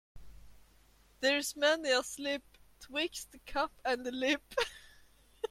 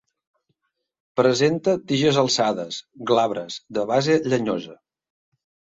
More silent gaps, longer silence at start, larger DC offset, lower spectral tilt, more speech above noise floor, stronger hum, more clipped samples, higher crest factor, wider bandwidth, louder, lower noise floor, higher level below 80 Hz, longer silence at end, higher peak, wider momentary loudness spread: neither; second, 0.15 s vs 1.15 s; neither; second, -1.5 dB/octave vs -5 dB/octave; second, 30 dB vs 56 dB; neither; neither; about the same, 20 dB vs 20 dB; first, 16.5 kHz vs 7.8 kHz; second, -34 LUFS vs -22 LUFS; second, -64 dBFS vs -77 dBFS; about the same, -60 dBFS vs -64 dBFS; second, 0.05 s vs 1 s; second, -16 dBFS vs -4 dBFS; about the same, 10 LU vs 12 LU